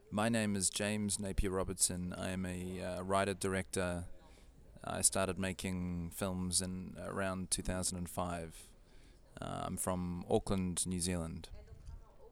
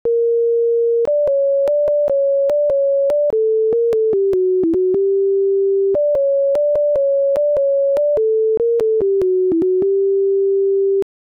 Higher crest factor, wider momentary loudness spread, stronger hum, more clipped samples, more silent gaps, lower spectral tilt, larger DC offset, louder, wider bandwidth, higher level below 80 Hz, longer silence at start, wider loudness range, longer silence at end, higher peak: first, 24 dB vs 4 dB; first, 13 LU vs 0 LU; neither; neither; neither; second, -4 dB/octave vs -8.5 dB/octave; neither; second, -37 LUFS vs -16 LUFS; first, 17.5 kHz vs 3.7 kHz; about the same, -52 dBFS vs -54 dBFS; about the same, 0.05 s vs 0.05 s; first, 3 LU vs 0 LU; second, 0 s vs 0.2 s; about the same, -14 dBFS vs -12 dBFS